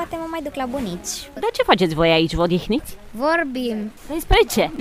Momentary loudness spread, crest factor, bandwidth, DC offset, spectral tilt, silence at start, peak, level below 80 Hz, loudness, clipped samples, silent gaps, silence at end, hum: 12 LU; 20 dB; 16 kHz; under 0.1%; -4.5 dB/octave; 0 s; 0 dBFS; -32 dBFS; -20 LUFS; under 0.1%; none; 0 s; none